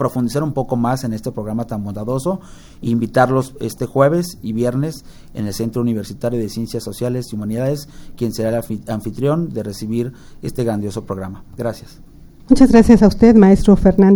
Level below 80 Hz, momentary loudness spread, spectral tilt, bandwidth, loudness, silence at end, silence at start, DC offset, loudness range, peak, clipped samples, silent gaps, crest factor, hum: -32 dBFS; 16 LU; -7.5 dB/octave; 18 kHz; -17 LUFS; 0 s; 0 s; under 0.1%; 9 LU; 0 dBFS; under 0.1%; none; 16 dB; none